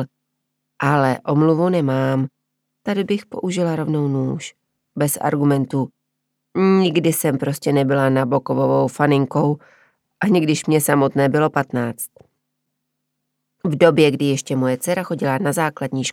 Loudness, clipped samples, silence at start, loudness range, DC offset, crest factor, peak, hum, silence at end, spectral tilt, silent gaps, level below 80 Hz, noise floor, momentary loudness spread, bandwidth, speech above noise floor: -19 LUFS; under 0.1%; 0 s; 4 LU; under 0.1%; 18 dB; 0 dBFS; none; 0 s; -6 dB/octave; none; -66 dBFS; -76 dBFS; 9 LU; 17 kHz; 58 dB